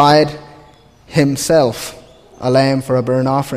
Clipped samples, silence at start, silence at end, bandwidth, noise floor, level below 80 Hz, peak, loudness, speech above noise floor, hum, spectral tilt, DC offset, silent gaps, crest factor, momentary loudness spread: under 0.1%; 0 s; 0 s; 15.5 kHz; -45 dBFS; -46 dBFS; 0 dBFS; -15 LUFS; 31 dB; none; -5.5 dB/octave; under 0.1%; none; 16 dB; 12 LU